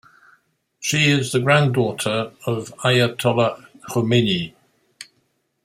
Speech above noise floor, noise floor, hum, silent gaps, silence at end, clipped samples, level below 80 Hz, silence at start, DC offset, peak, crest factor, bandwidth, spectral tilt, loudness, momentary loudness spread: 49 dB; -68 dBFS; none; none; 0.6 s; under 0.1%; -58 dBFS; 0.8 s; under 0.1%; -2 dBFS; 18 dB; 16 kHz; -5 dB/octave; -19 LUFS; 10 LU